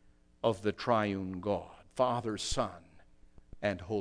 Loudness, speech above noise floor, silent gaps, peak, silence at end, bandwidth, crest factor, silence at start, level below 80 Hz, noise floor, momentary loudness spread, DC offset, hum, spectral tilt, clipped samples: -34 LUFS; 25 dB; none; -14 dBFS; 0 s; 11 kHz; 20 dB; 0.45 s; -54 dBFS; -58 dBFS; 7 LU; under 0.1%; none; -5 dB/octave; under 0.1%